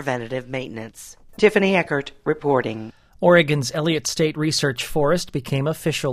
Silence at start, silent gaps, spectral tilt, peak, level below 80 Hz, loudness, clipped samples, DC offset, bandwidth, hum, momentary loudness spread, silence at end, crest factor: 0 s; none; -5 dB/octave; -2 dBFS; -50 dBFS; -21 LUFS; under 0.1%; under 0.1%; 15.5 kHz; none; 17 LU; 0 s; 20 dB